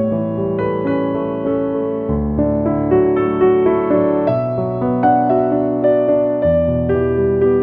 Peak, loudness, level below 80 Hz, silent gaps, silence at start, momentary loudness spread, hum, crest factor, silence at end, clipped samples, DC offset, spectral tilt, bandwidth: -2 dBFS; -16 LUFS; -36 dBFS; none; 0 s; 5 LU; none; 14 dB; 0 s; under 0.1%; under 0.1%; -11.5 dB/octave; 4.3 kHz